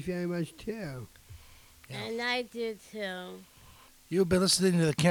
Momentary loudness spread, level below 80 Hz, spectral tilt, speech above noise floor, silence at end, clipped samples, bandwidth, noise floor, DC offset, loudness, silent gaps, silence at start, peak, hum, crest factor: 20 LU; -58 dBFS; -4.5 dB/octave; 26 dB; 0 s; under 0.1%; 19.5 kHz; -56 dBFS; under 0.1%; -30 LUFS; none; 0 s; -12 dBFS; none; 20 dB